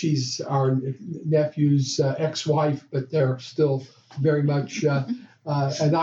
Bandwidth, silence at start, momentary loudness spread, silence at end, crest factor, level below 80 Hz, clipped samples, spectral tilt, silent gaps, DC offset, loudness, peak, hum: 7.8 kHz; 0 s; 8 LU; 0 s; 14 dB; -70 dBFS; under 0.1%; -6.5 dB/octave; none; under 0.1%; -24 LUFS; -10 dBFS; none